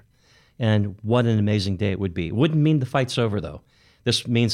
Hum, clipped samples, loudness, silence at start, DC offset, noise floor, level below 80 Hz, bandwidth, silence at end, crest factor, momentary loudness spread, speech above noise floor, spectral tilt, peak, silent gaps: none; under 0.1%; -22 LUFS; 0.6 s; under 0.1%; -58 dBFS; -50 dBFS; 12 kHz; 0 s; 14 dB; 7 LU; 37 dB; -6.5 dB/octave; -8 dBFS; none